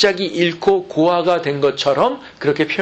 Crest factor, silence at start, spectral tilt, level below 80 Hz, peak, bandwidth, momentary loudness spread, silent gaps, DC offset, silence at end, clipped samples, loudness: 16 dB; 0 s; -5 dB/octave; -56 dBFS; -2 dBFS; 8.4 kHz; 4 LU; none; under 0.1%; 0 s; under 0.1%; -17 LUFS